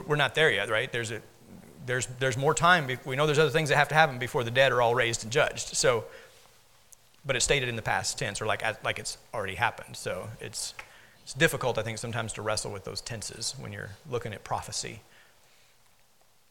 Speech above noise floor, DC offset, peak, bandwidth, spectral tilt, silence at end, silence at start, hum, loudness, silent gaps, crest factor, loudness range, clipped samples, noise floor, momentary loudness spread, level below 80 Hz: 37 dB; under 0.1%; -4 dBFS; 18 kHz; -3.5 dB/octave; 1.5 s; 0 s; none; -28 LUFS; none; 24 dB; 10 LU; under 0.1%; -65 dBFS; 14 LU; -54 dBFS